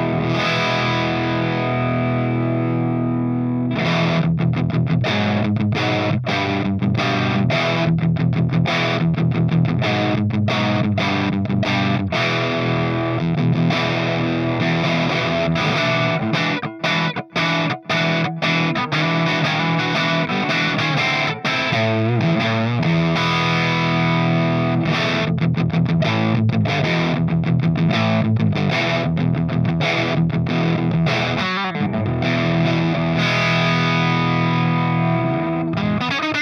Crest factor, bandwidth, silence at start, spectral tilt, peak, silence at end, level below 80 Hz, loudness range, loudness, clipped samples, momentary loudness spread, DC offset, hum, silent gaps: 12 dB; 6.8 kHz; 0 s; -6.5 dB/octave; -6 dBFS; 0 s; -50 dBFS; 1 LU; -19 LUFS; under 0.1%; 3 LU; under 0.1%; none; none